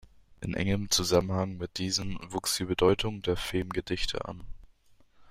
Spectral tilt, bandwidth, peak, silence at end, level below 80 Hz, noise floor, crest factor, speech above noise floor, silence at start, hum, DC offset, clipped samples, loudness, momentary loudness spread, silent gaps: -4 dB/octave; 16 kHz; -10 dBFS; 0 s; -46 dBFS; -60 dBFS; 20 dB; 30 dB; 0.4 s; none; under 0.1%; under 0.1%; -30 LUFS; 11 LU; none